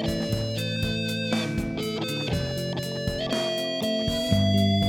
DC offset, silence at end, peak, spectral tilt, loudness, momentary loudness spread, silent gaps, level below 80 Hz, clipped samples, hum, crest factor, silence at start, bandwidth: under 0.1%; 0 s; -8 dBFS; -5.5 dB/octave; -26 LUFS; 7 LU; none; -44 dBFS; under 0.1%; none; 16 dB; 0 s; 18.5 kHz